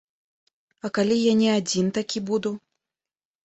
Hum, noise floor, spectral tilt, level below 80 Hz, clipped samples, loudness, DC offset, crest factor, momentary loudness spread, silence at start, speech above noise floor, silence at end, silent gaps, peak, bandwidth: none; under -90 dBFS; -5 dB/octave; -66 dBFS; under 0.1%; -23 LUFS; under 0.1%; 16 dB; 12 LU; 0.85 s; over 67 dB; 0.85 s; none; -10 dBFS; 8.2 kHz